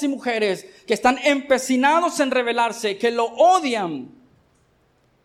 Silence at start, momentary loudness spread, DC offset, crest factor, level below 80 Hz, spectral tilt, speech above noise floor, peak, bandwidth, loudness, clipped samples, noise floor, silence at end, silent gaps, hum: 0 s; 9 LU; under 0.1%; 16 dB; -60 dBFS; -3 dB/octave; 42 dB; -4 dBFS; 16 kHz; -20 LUFS; under 0.1%; -61 dBFS; 1.15 s; none; none